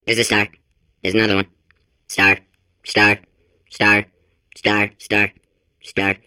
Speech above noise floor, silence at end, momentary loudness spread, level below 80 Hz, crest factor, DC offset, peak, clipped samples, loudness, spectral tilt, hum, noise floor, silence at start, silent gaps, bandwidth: 44 dB; 0.1 s; 12 LU; -54 dBFS; 18 dB; under 0.1%; -2 dBFS; under 0.1%; -17 LUFS; -3.5 dB/octave; none; -62 dBFS; 0.05 s; none; 16.5 kHz